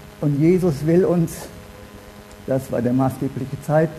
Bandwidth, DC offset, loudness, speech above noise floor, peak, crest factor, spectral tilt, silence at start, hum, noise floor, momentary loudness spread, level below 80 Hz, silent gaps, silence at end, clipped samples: 13.5 kHz; under 0.1%; -20 LUFS; 22 dB; -4 dBFS; 16 dB; -8 dB/octave; 0 s; none; -41 dBFS; 23 LU; -46 dBFS; none; 0 s; under 0.1%